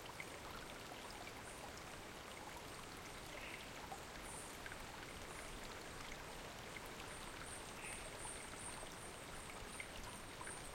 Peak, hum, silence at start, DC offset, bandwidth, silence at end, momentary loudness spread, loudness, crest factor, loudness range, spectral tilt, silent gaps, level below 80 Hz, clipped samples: -34 dBFS; none; 0 s; under 0.1%; 16.5 kHz; 0 s; 3 LU; -51 LUFS; 18 dB; 2 LU; -2.5 dB/octave; none; -62 dBFS; under 0.1%